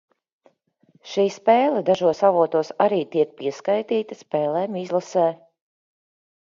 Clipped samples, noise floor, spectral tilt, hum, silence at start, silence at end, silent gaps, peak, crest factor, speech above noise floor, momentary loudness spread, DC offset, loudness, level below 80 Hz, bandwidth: under 0.1%; -61 dBFS; -6 dB/octave; none; 1.05 s; 1.15 s; none; -4 dBFS; 18 dB; 40 dB; 8 LU; under 0.1%; -22 LUFS; -72 dBFS; 7.6 kHz